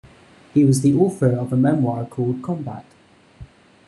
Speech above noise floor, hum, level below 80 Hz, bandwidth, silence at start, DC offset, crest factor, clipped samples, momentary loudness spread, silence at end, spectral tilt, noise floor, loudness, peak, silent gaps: 30 dB; none; -52 dBFS; 12.5 kHz; 0.55 s; under 0.1%; 16 dB; under 0.1%; 12 LU; 0.4 s; -8 dB/octave; -48 dBFS; -19 LUFS; -4 dBFS; none